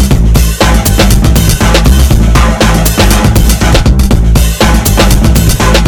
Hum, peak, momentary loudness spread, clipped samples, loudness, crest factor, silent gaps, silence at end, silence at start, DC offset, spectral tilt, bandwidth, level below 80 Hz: none; 0 dBFS; 1 LU; 3%; -7 LUFS; 6 dB; none; 0 s; 0 s; under 0.1%; -5 dB/octave; over 20 kHz; -8 dBFS